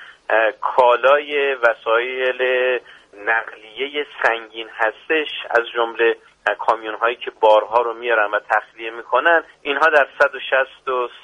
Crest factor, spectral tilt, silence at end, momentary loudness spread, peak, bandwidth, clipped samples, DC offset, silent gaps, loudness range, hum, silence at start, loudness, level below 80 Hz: 18 dB; -3 dB/octave; 0.05 s; 9 LU; -2 dBFS; 9.6 kHz; under 0.1%; under 0.1%; none; 4 LU; none; 0 s; -18 LUFS; -66 dBFS